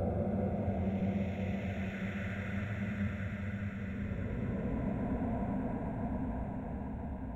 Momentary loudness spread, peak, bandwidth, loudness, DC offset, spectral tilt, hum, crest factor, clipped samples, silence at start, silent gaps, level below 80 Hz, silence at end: 5 LU; -22 dBFS; 7.8 kHz; -37 LUFS; under 0.1%; -9 dB/octave; none; 14 dB; under 0.1%; 0 s; none; -46 dBFS; 0 s